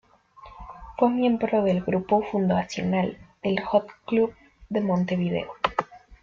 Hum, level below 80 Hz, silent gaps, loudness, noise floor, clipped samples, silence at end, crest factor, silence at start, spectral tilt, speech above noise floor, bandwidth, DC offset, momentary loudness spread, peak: none; -54 dBFS; none; -25 LUFS; -50 dBFS; under 0.1%; 0.1 s; 18 dB; 0.4 s; -7.5 dB/octave; 26 dB; 7.2 kHz; under 0.1%; 9 LU; -6 dBFS